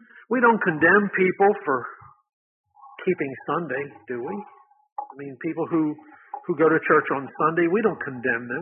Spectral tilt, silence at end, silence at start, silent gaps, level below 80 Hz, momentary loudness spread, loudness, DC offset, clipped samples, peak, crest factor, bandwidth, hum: -11.5 dB/octave; 0 s; 0.3 s; 2.33-2.64 s, 4.92-4.96 s; -68 dBFS; 18 LU; -23 LUFS; under 0.1%; under 0.1%; -4 dBFS; 20 dB; 3.6 kHz; none